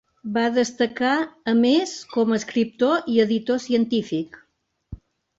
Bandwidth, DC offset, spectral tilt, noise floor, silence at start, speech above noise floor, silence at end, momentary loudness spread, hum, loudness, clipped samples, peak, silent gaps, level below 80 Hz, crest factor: 8 kHz; under 0.1%; -4.5 dB/octave; -70 dBFS; 0.25 s; 49 dB; 0.4 s; 7 LU; none; -22 LUFS; under 0.1%; -6 dBFS; none; -56 dBFS; 16 dB